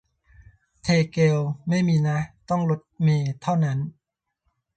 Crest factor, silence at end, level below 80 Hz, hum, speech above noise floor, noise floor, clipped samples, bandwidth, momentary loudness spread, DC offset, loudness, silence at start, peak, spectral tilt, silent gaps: 16 dB; 0.85 s; -56 dBFS; none; 58 dB; -80 dBFS; under 0.1%; 8.8 kHz; 7 LU; under 0.1%; -23 LUFS; 0.85 s; -8 dBFS; -7 dB/octave; none